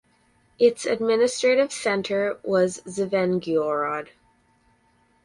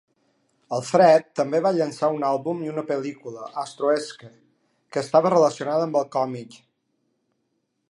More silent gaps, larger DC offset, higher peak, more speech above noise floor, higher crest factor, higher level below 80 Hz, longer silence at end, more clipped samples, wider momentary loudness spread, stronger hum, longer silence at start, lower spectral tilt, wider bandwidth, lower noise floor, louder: neither; neither; about the same, -6 dBFS vs -4 dBFS; second, 41 dB vs 52 dB; about the same, 18 dB vs 20 dB; first, -66 dBFS vs -76 dBFS; second, 1.2 s vs 1.45 s; neither; second, 6 LU vs 15 LU; neither; about the same, 0.6 s vs 0.7 s; about the same, -4.5 dB/octave vs -5.5 dB/octave; about the same, 11.5 kHz vs 11.5 kHz; second, -63 dBFS vs -74 dBFS; about the same, -23 LUFS vs -22 LUFS